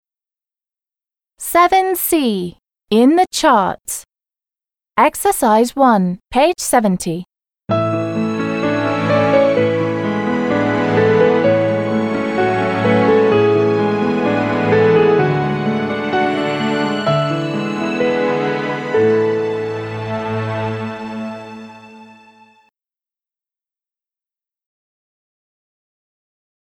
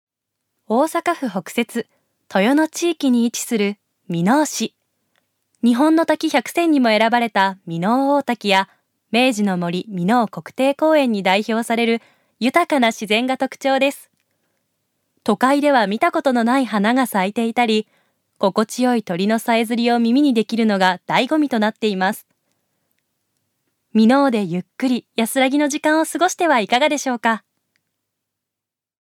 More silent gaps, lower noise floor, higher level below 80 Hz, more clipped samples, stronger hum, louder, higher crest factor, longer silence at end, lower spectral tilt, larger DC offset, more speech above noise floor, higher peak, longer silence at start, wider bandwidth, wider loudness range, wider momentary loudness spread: neither; first, under -90 dBFS vs -85 dBFS; first, -52 dBFS vs -74 dBFS; neither; neither; about the same, -16 LUFS vs -18 LUFS; about the same, 16 dB vs 18 dB; first, 4.65 s vs 1.7 s; about the same, -5.5 dB/octave vs -4.5 dB/octave; neither; first, over 76 dB vs 68 dB; about the same, -2 dBFS vs -2 dBFS; first, 1.4 s vs 0.7 s; first, 19 kHz vs 17 kHz; first, 7 LU vs 3 LU; first, 11 LU vs 7 LU